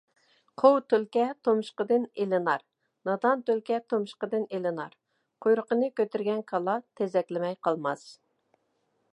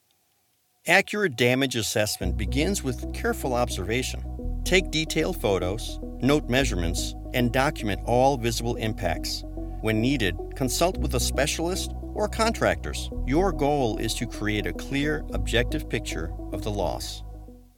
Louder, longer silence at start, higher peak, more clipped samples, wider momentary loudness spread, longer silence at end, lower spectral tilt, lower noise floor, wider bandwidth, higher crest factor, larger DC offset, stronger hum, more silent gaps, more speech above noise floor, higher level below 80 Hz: about the same, -28 LUFS vs -26 LUFS; second, 0.6 s vs 0.85 s; second, -6 dBFS vs -2 dBFS; neither; about the same, 8 LU vs 10 LU; first, 1 s vs 0.15 s; first, -6.5 dB/octave vs -4.5 dB/octave; first, -74 dBFS vs -68 dBFS; second, 10.5 kHz vs 19 kHz; about the same, 22 dB vs 22 dB; neither; neither; neither; first, 47 dB vs 43 dB; second, -84 dBFS vs -34 dBFS